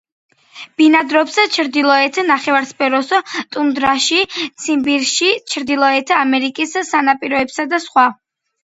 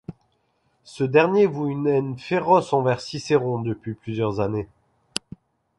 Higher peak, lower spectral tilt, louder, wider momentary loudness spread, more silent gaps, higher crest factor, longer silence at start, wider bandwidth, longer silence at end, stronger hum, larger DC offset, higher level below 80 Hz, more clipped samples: about the same, 0 dBFS vs -2 dBFS; second, -1.5 dB/octave vs -6.5 dB/octave; first, -15 LUFS vs -23 LUFS; second, 6 LU vs 13 LU; neither; second, 16 dB vs 22 dB; first, 0.55 s vs 0.1 s; second, 8 kHz vs 11.5 kHz; second, 0.5 s vs 1.15 s; neither; neither; about the same, -58 dBFS vs -56 dBFS; neither